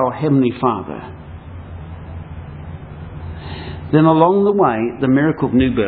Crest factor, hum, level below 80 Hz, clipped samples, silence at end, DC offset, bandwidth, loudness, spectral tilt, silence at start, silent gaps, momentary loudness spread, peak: 18 dB; none; -40 dBFS; under 0.1%; 0 s; under 0.1%; 4.7 kHz; -15 LUFS; -12 dB/octave; 0 s; none; 20 LU; 0 dBFS